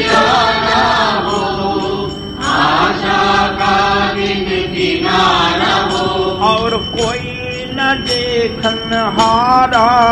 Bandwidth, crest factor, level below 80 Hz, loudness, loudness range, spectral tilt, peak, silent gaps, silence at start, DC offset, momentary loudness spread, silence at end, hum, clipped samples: 12.5 kHz; 14 dB; -34 dBFS; -13 LUFS; 2 LU; -4 dB/octave; 0 dBFS; none; 0 s; under 0.1%; 7 LU; 0 s; none; under 0.1%